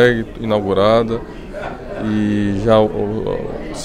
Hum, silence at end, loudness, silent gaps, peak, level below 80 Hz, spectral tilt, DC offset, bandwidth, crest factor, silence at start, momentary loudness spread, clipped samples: none; 0 s; -17 LUFS; none; 0 dBFS; -34 dBFS; -6.5 dB/octave; under 0.1%; 10.5 kHz; 16 dB; 0 s; 14 LU; under 0.1%